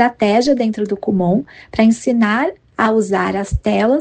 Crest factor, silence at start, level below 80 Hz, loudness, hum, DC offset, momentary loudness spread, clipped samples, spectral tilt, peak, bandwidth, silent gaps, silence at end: 16 dB; 0 s; -36 dBFS; -16 LUFS; none; under 0.1%; 6 LU; under 0.1%; -6 dB/octave; 0 dBFS; 9.2 kHz; none; 0 s